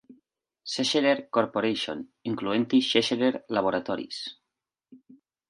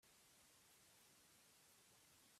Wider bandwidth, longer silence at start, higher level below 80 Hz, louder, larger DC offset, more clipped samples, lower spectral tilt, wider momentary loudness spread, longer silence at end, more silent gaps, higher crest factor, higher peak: second, 11.5 kHz vs 15.5 kHz; about the same, 0.1 s vs 0 s; first, -70 dBFS vs under -90 dBFS; first, -26 LUFS vs -69 LUFS; neither; neither; first, -4 dB/octave vs -1 dB/octave; first, 13 LU vs 0 LU; first, 0.55 s vs 0 s; neither; first, 22 dB vs 14 dB; first, -6 dBFS vs -58 dBFS